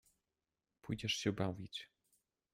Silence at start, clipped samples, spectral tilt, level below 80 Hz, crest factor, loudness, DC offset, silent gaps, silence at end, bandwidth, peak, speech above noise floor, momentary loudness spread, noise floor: 0.85 s; under 0.1%; -4.5 dB/octave; -70 dBFS; 22 dB; -41 LUFS; under 0.1%; none; 0.7 s; 15.5 kHz; -22 dBFS; over 50 dB; 18 LU; under -90 dBFS